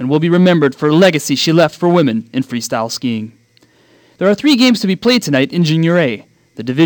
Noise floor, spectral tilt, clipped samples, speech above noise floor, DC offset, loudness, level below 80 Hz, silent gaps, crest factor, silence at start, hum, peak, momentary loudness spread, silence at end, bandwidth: -51 dBFS; -5.5 dB/octave; under 0.1%; 39 dB; under 0.1%; -13 LUFS; -60 dBFS; none; 14 dB; 0 s; none; 0 dBFS; 10 LU; 0 s; 19.5 kHz